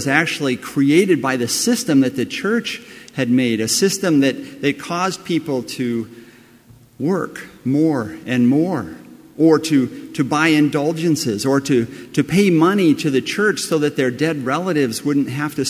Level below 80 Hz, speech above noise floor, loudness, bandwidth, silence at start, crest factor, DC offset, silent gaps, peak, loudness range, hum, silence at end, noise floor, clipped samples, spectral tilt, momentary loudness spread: -58 dBFS; 30 dB; -18 LUFS; 16 kHz; 0 s; 18 dB; under 0.1%; none; 0 dBFS; 5 LU; none; 0 s; -47 dBFS; under 0.1%; -5 dB/octave; 9 LU